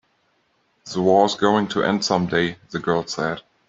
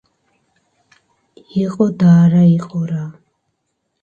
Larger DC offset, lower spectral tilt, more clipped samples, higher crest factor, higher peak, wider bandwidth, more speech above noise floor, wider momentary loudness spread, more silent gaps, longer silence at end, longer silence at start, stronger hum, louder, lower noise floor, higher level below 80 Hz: neither; second, -5 dB/octave vs -9.5 dB/octave; neither; about the same, 18 dB vs 16 dB; about the same, -4 dBFS vs -2 dBFS; first, 8 kHz vs 7 kHz; second, 46 dB vs 58 dB; second, 9 LU vs 15 LU; neither; second, 0.3 s vs 0.9 s; second, 0.85 s vs 1.55 s; neither; second, -21 LUFS vs -14 LUFS; second, -66 dBFS vs -71 dBFS; about the same, -58 dBFS vs -58 dBFS